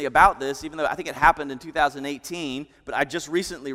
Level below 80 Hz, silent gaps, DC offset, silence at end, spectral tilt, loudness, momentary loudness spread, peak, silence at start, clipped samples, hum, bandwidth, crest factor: -44 dBFS; none; under 0.1%; 0 s; -3.5 dB/octave; -24 LUFS; 13 LU; -2 dBFS; 0 s; under 0.1%; none; 16 kHz; 22 dB